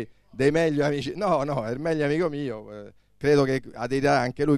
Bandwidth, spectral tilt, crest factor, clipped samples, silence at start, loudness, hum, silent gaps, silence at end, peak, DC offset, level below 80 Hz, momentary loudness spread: 12.5 kHz; -6.5 dB/octave; 16 dB; under 0.1%; 0 s; -25 LUFS; none; none; 0 s; -8 dBFS; 0.1%; -52 dBFS; 12 LU